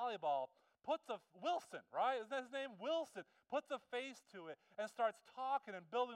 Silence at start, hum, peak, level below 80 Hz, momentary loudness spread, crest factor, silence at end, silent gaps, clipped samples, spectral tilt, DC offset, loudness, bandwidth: 0 s; none; -26 dBFS; under -90 dBFS; 12 LU; 18 dB; 0 s; none; under 0.1%; -3.5 dB/octave; under 0.1%; -44 LUFS; 14 kHz